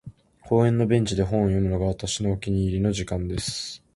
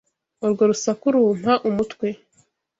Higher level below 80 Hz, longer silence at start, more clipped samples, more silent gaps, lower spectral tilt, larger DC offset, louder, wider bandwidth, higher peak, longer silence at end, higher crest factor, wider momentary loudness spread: first, -40 dBFS vs -60 dBFS; second, 0.05 s vs 0.4 s; neither; neither; about the same, -6 dB/octave vs -5.5 dB/octave; neither; second, -24 LUFS vs -21 LUFS; first, 11.5 kHz vs 8 kHz; about the same, -6 dBFS vs -4 dBFS; second, 0.2 s vs 0.65 s; about the same, 18 dB vs 16 dB; second, 7 LU vs 10 LU